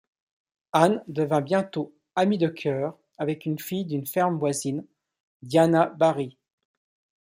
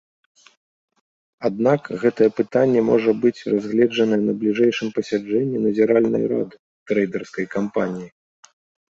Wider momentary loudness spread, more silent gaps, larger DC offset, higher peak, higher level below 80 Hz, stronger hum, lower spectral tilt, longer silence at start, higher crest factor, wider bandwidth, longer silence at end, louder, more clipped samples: about the same, 11 LU vs 9 LU; second, 5.20-5.40 s vs 6.59-6.86 s; neither; about the same, -4 dBFS vs -4 dBFS; second, -70 dBFS vs -64 dBFS; neither; about the same, -6 dB/octave vs -7 dB/octave; second, 0.75 s vs 1.4 s; first, 22 dB vs 16 dB; first, 16 kHz vs 7.6 kHz; about the same, 0.9 s vs 0.85 s; second, -25 LUFS vs -20 LUFS; neither